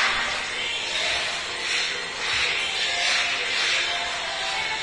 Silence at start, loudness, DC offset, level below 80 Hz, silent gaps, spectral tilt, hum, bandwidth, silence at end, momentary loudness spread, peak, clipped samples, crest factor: 0 s; -23 LUFS; under 0.1%; -54 dBFS; none; 0.5 dB/octave; none; 11 kHz; 0 s; 5 LU; -10 dBFS; under 0.1%; 16 dB